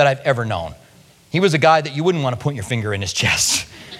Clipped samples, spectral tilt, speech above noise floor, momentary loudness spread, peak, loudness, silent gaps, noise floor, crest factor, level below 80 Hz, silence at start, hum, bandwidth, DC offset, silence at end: under 0.1%; -4 dB/octave; 31 dB; 10 LU; 0 dBFS; -18 LUFS; none; -49 dBFS; 18 dB; -48 dBFS; 0 s; none; 16.5 kHz; under 0.1%; 0 s